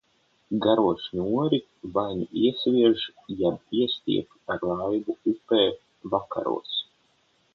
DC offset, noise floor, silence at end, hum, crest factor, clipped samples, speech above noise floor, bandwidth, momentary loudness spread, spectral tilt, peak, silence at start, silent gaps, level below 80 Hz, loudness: under 0.1%; -66 dBFS; 0.7 s; none; 20 dB; under 0.1%; 41 dB; 5.8 kHz; 9 LU; -8 dB/octave; -6 dBFS; 0.5 s; none; -60 dBFS; -26 LUFS